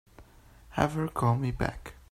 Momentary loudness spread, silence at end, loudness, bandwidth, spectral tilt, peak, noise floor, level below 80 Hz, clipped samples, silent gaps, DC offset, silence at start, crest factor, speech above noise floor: 10 LU; 0.2 s; -30 LUFS; 15 kHz; -7 dB/octave; -8 dBFS; -55 dBFS; -46 dBFS; under 0.1%; none; under 0.1%; 0.2 s; 22 dB; 26 dB